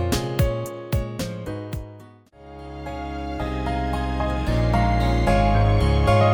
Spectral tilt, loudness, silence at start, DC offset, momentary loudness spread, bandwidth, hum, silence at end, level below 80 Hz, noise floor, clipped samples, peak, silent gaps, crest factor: -6.5 dB/octave; -23 LUFS; 0 s; under 0.1%; 15 LU; 19.5 kHz; none; 0 s; -28 dBFS; -46 dBFS; under 0.1%; -6 dBFS; none; 16 dB